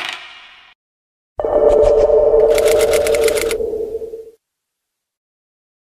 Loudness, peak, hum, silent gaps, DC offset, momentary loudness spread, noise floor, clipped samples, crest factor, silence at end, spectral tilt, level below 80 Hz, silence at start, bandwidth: -14 LUFS; 0 dBFS; none; 0.75-1.36 s; under 0.1%; 19 LU; -78 dBFS; under 0.1%; 16 dB; 1.7 s; -3 dB/octave; -36 dBFS; 0 s; 16 kHz